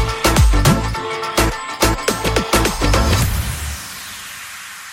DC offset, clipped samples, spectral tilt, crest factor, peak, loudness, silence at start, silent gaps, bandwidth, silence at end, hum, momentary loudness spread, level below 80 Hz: under 0.1%; under 0.1%; -4 dB/octave; 16 dB; 0 dBFS; -17 LUFS; 0 s; none; 16.5 kHz; 0 s; none; 15 LU; -22 dBFS